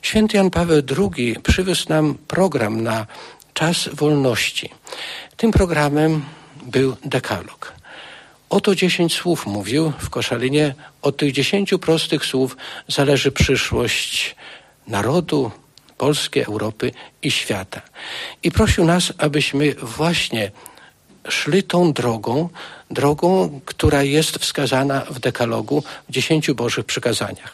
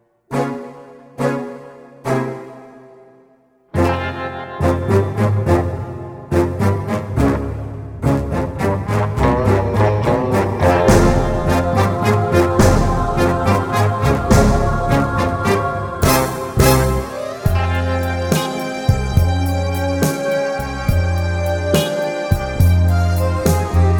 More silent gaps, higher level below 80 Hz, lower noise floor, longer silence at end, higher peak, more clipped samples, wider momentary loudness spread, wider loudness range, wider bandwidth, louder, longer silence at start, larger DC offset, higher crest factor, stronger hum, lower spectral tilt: neither; second, -36 dBFS vs -26 dBFS; second, -48 dBFS vs -53 dBFS; about the same, 0 s vs 0 s; second, -4 dBFS vs 0 dBFS; neither; about the same, 12 LU vs 10 LU; second, 3 LU vs 6 LU; second, 13.5 kHz vs over 20 kHz; about the same, -19 LUFS vs -17 LUFS; second, 0.05 s vs 0.3 s; neither; about the same, 16 dB vs 16 dB; neither; second, -5 dB/octave vs -6.5 dB/octave